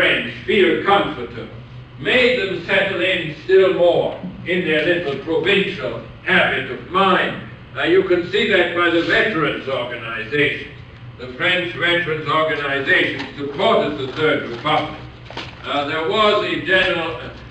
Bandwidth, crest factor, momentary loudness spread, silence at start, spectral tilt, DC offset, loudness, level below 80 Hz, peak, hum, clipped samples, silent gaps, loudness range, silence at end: 9.2 kHz; 16 dB; 15 LU; 0 s; -5.5 dB/octave; under 0.1%; -18 LUFS; -48 dBFS; -2 dBFS; none; under 0.1%; none; 2 LU; 0 s